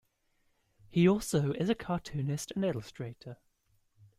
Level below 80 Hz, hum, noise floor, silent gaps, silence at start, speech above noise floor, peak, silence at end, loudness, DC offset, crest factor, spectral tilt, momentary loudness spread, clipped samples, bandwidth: -60 dBFS; none; -74 dBFS; none; 0.9 s; 43 dB; -14 dBFS; 0.85 s; -31 LUFS; under 0.1%; 20 dB; -6.5 dB/octave; 17 LU; under 0.1%; 15.5 kHz